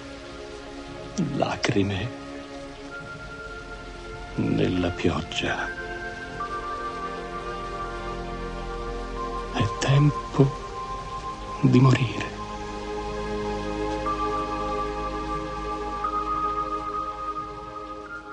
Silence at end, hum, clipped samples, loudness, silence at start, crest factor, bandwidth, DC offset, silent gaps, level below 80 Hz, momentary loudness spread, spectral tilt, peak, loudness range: 0 s; none; under 0.1%; -28 LUFS; 0 s; 22 dB; 10 kHz; under 0.1%; none; -42 dBFS; 15 LU; -6.5 dB/octave; -4 dBFS; 7 LU